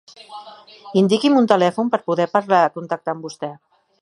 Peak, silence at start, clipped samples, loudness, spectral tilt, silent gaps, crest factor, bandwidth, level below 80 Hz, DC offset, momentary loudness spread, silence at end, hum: 0 dBFS; 0.3 s; under 0.1%; -18 LUFS; -6 dB/octave; none; 18 dB; 11.5 kHz; -70 dBFS; under 0.1%; 21 LU; 0.45 s; none